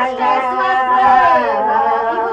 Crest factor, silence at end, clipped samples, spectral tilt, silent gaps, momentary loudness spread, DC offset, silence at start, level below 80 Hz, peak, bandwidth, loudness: 12 dB; 0 s; under 0.1%; -4.5 dB/octave; none; 5 LU; under 0.1%; 0 s; -50 dBFS; -2 dBFS; 8.2 kHz; -13 LUFS